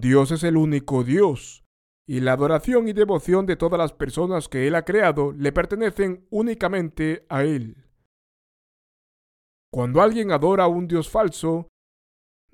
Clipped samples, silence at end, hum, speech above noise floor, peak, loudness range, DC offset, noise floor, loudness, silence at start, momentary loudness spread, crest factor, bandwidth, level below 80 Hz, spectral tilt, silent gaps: under 0.1%; 0.9 s; none; over 69 dB; -4 dBFS; 6 LU; under 0.1%; under -90 dBFS; -21 LUFS; 0 s; 8 LU; 18 dB; 15 kHz; -44 dBFS; -7 dB/octave; 1.66-2.05 s, 8.05-9.72 s